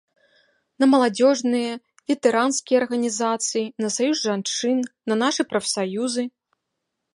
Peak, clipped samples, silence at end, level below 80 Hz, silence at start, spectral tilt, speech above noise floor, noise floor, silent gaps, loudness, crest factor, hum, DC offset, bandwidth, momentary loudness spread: -4 dBFS; under 0.1%; 0.85 s; -74 dBFS; 0.8 s; -3 dB/octave; 58 dB; -79 dBFS; none; -22 LUFS; 18 dB; none; under 0.1%; 11.5 kHz; 7 LU